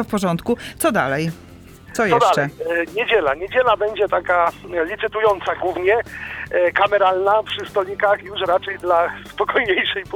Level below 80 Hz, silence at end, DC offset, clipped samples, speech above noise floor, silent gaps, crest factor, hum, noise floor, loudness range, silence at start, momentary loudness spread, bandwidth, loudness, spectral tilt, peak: -50 dBFS; 0 s; under 0.1%; under 0.1%; 22 dB; none; 18 dB; none; -41 dBFS; 1 LU; 0 s; 8 LU; 19.5 kHz; -19 LUFS; -4.5 dB/octave; -2 dBFS